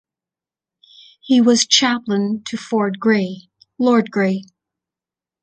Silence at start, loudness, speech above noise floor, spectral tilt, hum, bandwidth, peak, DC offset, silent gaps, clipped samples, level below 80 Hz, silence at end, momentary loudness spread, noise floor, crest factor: 1.25 s; -17 LUFS; 73 dB; -3.5 dB/octave; none; 9 kHz; 0 dBFS; under 0.1%; none; under 0.1%; -66 dBFS; 1 s; 12 LU; -89 dBFS; 20 dB